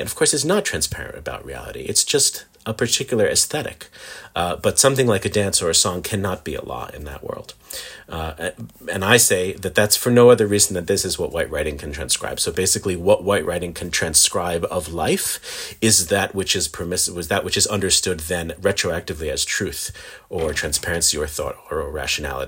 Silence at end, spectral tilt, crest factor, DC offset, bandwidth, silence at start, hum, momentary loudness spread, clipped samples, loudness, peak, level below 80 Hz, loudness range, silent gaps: 0 s; -2.5 dB/octave; 20 dB; under 0.1%; 17 kHz; 0 s; none; 16 LU; under 0.1%; -19 LUFS; 0 dBFS; -44 dBFS; 5 LU; none